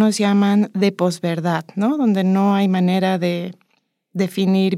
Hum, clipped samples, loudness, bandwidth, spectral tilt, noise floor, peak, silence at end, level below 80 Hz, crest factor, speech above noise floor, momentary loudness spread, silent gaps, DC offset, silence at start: none; under 0.1%; -18 LUFS; 13.5 kHz; -6.5 dB/octave; -67 dBFS; -4 dBFS; 0 s; -74 dBFS; 14 dB; 49 dB; 7 LU; none; under 0.1%; 0 s